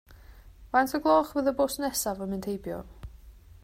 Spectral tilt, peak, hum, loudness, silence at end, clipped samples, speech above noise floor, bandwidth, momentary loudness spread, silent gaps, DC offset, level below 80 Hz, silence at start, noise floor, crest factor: -4 dB/octave; -10 dBFS; none; -28 LUFS; 0.25 s; under 0.1%; 23 dB; 16 kHz; 19 LU; none; under 0.1%; -50 dBFS; 0.1 s; -50 dBFS; 20 dB